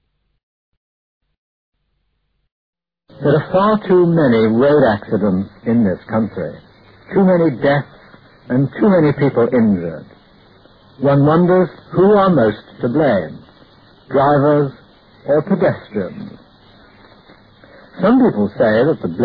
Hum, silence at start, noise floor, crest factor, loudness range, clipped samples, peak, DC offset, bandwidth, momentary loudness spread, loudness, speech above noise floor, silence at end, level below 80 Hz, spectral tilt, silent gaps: none; 3.2 s; -67 dBFS; 14 dB; 5 LU; under 0.1%; -2 dBFS; under 0.1%; 5 kHz; 11 LU; -15 LUFS; 53 dB; 0 s; -50 dBFS; -11 dB/octave; none